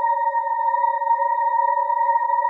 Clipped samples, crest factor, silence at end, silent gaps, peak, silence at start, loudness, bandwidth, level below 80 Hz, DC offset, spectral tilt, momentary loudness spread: under 0.1%; 10 dB; 0 s; none; -10 dBFS; 0 s; -20 LUFS; 4 kHz; under -90 dBFS; under 0.1%; 1 dB/octave; 2 LU